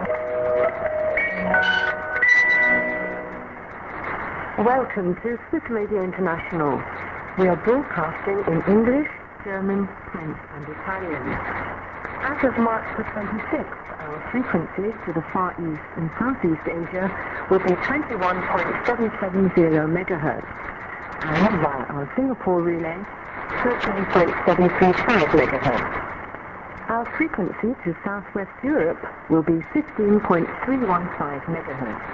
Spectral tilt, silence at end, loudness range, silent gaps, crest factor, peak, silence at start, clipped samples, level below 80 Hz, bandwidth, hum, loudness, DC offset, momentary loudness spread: -7.5 dB/octave; 0 s; 6 LU; none; 20 dB; -2 dBFS; 0 s; under 0.1%; -46 dBFS; 7.4 kHz; none; -22 LUFS; under 0.1%; 14 LU